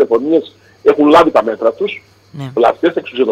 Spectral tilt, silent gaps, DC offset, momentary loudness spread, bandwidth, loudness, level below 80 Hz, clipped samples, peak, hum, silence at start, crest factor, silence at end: -6.5 dB/octave; none; under 0.1%; 13 LU; 10.5 kHz; -13 LUFS; -50 dBFS; under 0.1%; 0 dBFS; none; 0 s; 12 dB; 0 s